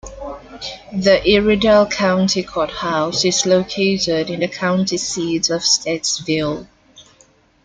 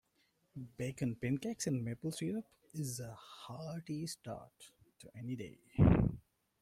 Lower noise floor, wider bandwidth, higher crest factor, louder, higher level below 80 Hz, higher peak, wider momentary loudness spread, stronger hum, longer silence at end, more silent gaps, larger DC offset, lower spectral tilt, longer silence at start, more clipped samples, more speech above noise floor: second, -53 dBFS vs -77 dBFS; second, 9.4 kHz vs 15.5 kHz; second, 16 dB vs 22 dB; first, -17 LUFS vs -38 LUFS; first, -44 dBFS vs -52 dBFS; first, -2 dBFS vs -16 dBFS; second, 15 LU vs 20 LU; neither; first, 0.65 s vs 0.4 s; neither; neither; second, -3.5 dB/octave vs -6.5 dB/octave; second, 0.05 s vs 0.55 s; neither; second, 36 dB vs 40 dB